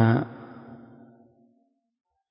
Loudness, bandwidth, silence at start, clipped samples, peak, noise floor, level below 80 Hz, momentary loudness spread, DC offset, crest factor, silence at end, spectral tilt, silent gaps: -26 LUFS; 5.4 kHz; 0 s; under 0.1%; -8 dBFS; -69 dBFS; -64 dBFS; 26 LU; under 0.1%; 22 dB; 1.55 s; -12 dB/octave; none